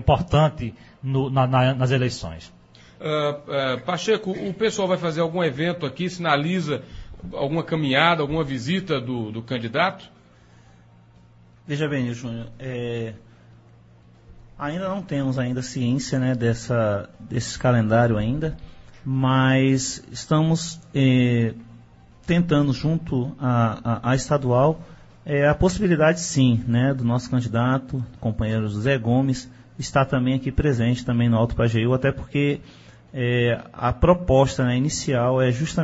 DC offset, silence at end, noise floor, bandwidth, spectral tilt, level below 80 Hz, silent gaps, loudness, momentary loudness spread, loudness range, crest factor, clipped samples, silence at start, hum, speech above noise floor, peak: under 0.1%; 0 s; -52 dBFS; 8 kHz; -6 dB/octave; -42 dBFS; none; -22 LUFS; 12 LU; 8 LU; 20 dB; under 0.1%; 0 s; none; 30 dB; -2 dBFS